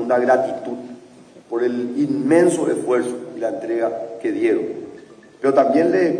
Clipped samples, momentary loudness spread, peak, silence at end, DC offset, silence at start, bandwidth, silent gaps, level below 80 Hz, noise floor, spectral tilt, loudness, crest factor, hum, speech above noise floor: under 0.1%; 14 LU; -4 dBFS; 0 s; under 0.1%; 0 s; 10.5 kHz; none; -68 dBFS; -45 dBFS; -6 dB/octave; -19 LUFS; 16 dB; none; 27 dB